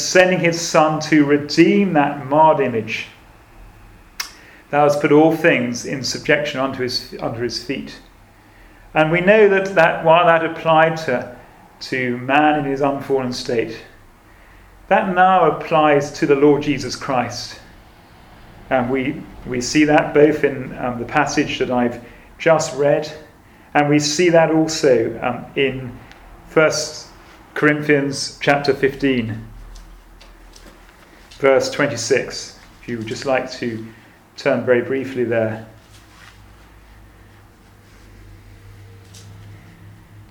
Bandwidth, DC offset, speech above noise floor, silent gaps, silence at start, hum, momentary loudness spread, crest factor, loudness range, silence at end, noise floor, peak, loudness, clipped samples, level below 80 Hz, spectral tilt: 17.5 kHz; under 0.1%; 30 dB; none; 0 s; none; 15 LU; 18 dB; 7 LU; 0.1 s; -47 dBFS; 0 dBFS; -17 LUFS; under 0.1%; -48 dBFS; -5 dB/octave